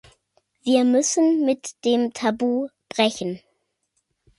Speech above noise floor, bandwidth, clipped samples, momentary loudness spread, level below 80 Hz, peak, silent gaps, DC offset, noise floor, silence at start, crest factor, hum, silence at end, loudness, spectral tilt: 53 dB; 11.5 kHz; under 0.1%; 12 LU; -66 dBFS; -4 dBFS; none; under 0.1%; -73 dBFS; 0.65 s; 18 dB; none; 1 s; -22 LUFS; -3.5 dB/octave